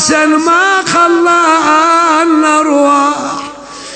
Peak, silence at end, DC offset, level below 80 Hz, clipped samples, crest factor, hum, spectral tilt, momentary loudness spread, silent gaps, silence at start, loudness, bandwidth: 0 dBFS; 0 s; under 0.1%; -52 dBFS; 0.1%; 10 dB; none; -2.5 dB/octave; 10 LU; none; 0 s; -8 LUFS; 9.2 kHz